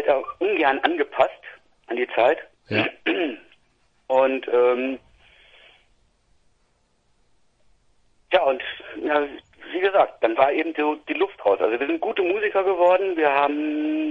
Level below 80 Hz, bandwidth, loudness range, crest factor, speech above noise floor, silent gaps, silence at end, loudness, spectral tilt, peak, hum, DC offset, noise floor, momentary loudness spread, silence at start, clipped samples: -64 dBFS; 7.2 kHz; 7 LU; 22 dB; 44 dB; none; 0 s; -22 LUFS; -6.5 dB/octave; -2 dBFS; none; under 0.1%; -66 dBFS; 10 LU; 0 s; under 0.1%